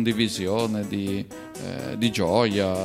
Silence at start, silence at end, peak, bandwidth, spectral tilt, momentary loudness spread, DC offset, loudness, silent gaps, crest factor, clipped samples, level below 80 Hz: 0 s; 0 s; -6 dBFS; 16 kHz; -5 dB/octave; 12 LU; under 0.1%; -25 LUFS; none; 18 dB; under 0.1%; -56 dBFS